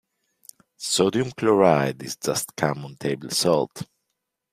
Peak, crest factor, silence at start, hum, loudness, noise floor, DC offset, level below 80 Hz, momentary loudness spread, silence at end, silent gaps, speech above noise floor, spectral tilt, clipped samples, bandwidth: -2 dBFS; 22 dB; 0.8 s; none; -23 LUFS; -80 dBFS; under 0.1%; -62 dBFS; 13 LU; 0.7 s; none; 57 dB; -4 dB/octave; under 0.1%; 16 kHz